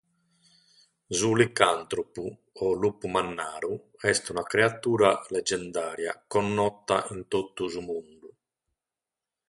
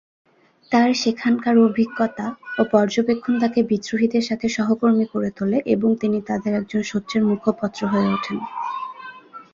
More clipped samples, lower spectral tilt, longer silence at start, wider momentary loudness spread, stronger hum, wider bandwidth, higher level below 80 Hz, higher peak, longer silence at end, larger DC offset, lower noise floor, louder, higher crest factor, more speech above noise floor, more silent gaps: neither; second, -4 dB/octave vs -6 dB/octave; first, 1.1 s vs 0.7 s; about the same, 11 LU vs 10 LU; neither; first, 11.5 kHz vs 7.4 kHz; about the same, -60 dBFS vs -60 dBFS; about the same, -2 dBFS vs -4 dBFS; first, 1.2 s vs 0.1 s; neither; first, -90 dBFS vs -40 dBFS; second, -27 LUFS vs -21 LUFS; first, 26 dB vs 18 dB; first, 63 dB vs 20 dB; neither